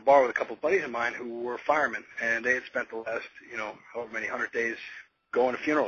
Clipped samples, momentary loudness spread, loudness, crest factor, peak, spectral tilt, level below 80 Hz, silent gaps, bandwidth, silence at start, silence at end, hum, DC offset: under 0.1%; 11 LU; -29 LUFS; 20 dB; -8 dBFS; -4 dB/octave; -68 dBFS; none; 7 kHz; 0 s; 0 s; none; under 0.1%